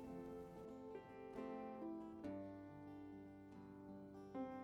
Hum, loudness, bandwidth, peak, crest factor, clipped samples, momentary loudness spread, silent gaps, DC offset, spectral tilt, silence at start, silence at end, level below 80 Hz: none; -54 LUFS; 17 kHz; -38 dBFS; 14 dB; under 0.1%; 7 LU; none; under 0.1%; -8 dB/octave; 0 s; 0 s; -76 dBFS